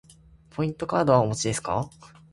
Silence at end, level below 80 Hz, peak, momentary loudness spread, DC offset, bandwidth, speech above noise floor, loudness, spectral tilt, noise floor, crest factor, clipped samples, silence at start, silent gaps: 0.25 s; -54 dBFS; -6 dBFS; 12 LU; under 0.1%; 11.5 kHz; 29 dB; -25 LUFS; -5.5 dB/octave; -53 dBFS; 22 dB; under 0.1%; 0.55 s; none